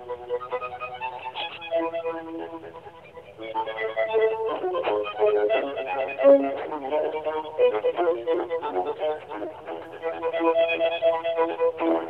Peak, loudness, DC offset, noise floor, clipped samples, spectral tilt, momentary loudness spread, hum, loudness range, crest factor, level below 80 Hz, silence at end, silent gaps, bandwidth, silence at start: -6 dBFS; -25 LUFS; under 0.1%; -45 dBFS; under 0.1%; -6.5 dB/octave; 14 LU; none; 8 LU; 18 dB; -66 dBFS; 0 s; none; 5.2 kHz; 0 s